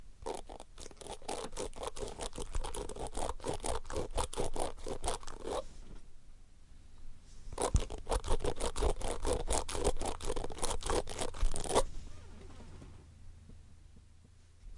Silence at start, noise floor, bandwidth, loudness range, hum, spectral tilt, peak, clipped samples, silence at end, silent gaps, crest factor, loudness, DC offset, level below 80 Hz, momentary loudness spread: 0 s; -59 dBFS; 11.5 kHz; 6 LU; none; -4 dB/octave; -12 dBFS; under 0.1%; 0 s; none; 24 dB; -39 LUFS; under 0.1%; -40 dBFS; 22 LU